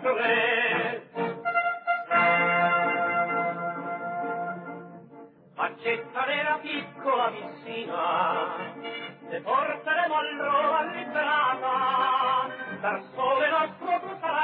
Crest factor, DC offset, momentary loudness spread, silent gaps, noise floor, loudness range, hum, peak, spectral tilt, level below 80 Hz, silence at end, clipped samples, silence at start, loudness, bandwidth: 16 dB; under 0.1%; 13 LU; none; -49 dBFS; 6 LU; none; -12 dBFS; -7.5 dB/octave; under -90 dBFS; 0 s; under 0.1%; 0 s; -26 LUFS; 4.8 kHz